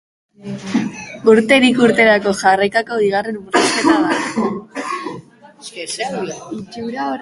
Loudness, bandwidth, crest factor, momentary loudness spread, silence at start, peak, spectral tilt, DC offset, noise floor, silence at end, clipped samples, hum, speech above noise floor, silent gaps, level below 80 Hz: -16 LUFS; 11.5 kHz; 16 dB; 18 LU; 0.4 s; 0 dBFS; -4 dB/octave; under 0.1%; -37 dBFS; 0 s; under 0.1%; none; 22 dB; none; -56 dBFS